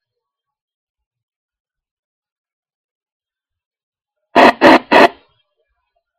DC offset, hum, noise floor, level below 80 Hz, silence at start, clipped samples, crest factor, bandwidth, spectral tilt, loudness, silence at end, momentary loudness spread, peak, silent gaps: under 0.1%; none; -80 dBFS; -54 dBFS; 4.35 s; under 0.1%; 18 dB; 16 kHz; -4.5 dB/octave; -9 LUFS; 1.1 s; 6 LU; 0 dBFS; none